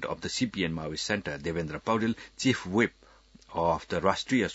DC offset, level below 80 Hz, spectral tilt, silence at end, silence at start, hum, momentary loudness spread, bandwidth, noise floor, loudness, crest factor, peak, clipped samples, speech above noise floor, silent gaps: under 0.1%; -56 dBFS; -4.5 dB/octave; 0 s; 0 s; none; 6 LU; 8 kHz; -56 dBFS; -30 LUFS; 22 dB; -8 dBFS; under 0.1%; 27 dB; none